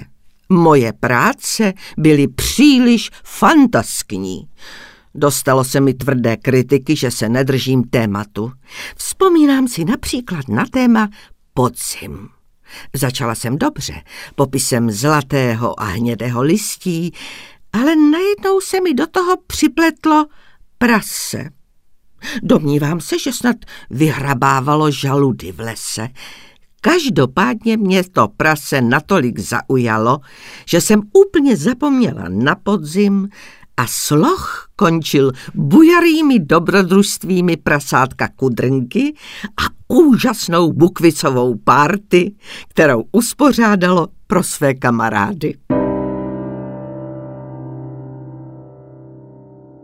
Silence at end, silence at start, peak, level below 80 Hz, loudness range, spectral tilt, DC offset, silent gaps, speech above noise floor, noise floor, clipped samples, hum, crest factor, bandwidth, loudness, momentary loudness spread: 0.65 s; 0 s; 0 dBFS; -44 dBFS; 6 LU; -5 dB/octave; under 0.1%; none; 33 dB; -47 dBFS; under 0.1%; none; 16 dB; 16 kHz; -15 LUFS; 15 LU